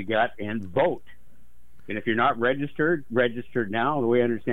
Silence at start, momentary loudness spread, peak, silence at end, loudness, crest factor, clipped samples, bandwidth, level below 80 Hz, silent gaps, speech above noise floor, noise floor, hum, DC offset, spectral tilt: 0 s; 8 LU; -8 dBFS; 0 s; -25 LUFS; 18 dB; under 0.1%; 4 kHz; -58 dBFS; none; 31 dB; -56 dBFS; none; 1%; -8 dB/octave